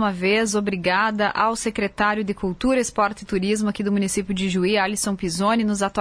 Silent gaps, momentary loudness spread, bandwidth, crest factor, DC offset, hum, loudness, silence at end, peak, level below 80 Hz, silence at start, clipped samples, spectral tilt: none; 4 LU; 11 kHz; 16 dB; under 0.1%; none; -22 LUFS; 0 s; -6 dBFS; -46 dBFS; 0 s; under 0.1%; -4.5 dB/octave